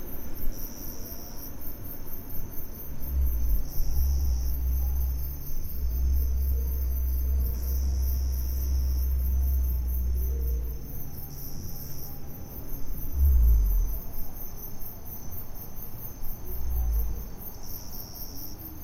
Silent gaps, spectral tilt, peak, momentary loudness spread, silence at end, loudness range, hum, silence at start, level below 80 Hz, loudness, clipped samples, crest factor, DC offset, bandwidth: none; -6 dB/octave; -12 dBFS; 12 LU; 0 s; 7 LU; none; 0 s; -28 dBFS; -32 LUFS; under 0.1%; 16 dB; under 0.1%; 16 kHz